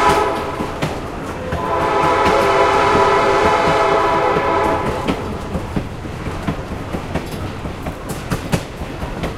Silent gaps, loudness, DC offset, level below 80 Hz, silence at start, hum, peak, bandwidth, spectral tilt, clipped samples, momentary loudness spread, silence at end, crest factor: none; -18 LUFS; under 0.1%; -32 dBFS; 0 s; none; 0 dBFS; 16 kHz; -5.5 dB/octave; under 0.1%; 13 LU; 0 s; 18 dB